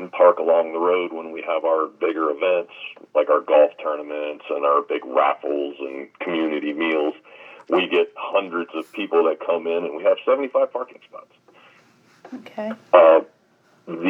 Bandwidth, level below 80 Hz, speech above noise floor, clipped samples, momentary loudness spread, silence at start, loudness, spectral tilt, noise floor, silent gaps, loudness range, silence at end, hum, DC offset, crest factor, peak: 4 kHz; under -90 dBFS; 38 dB; under 0.1%; 15 LU; 0 s; -21 LUFS; -6.5 dB/octave; -59 dBFS; none; 3 LU; 0 s; none; under 0.1%; 22 dB; 0 dBFS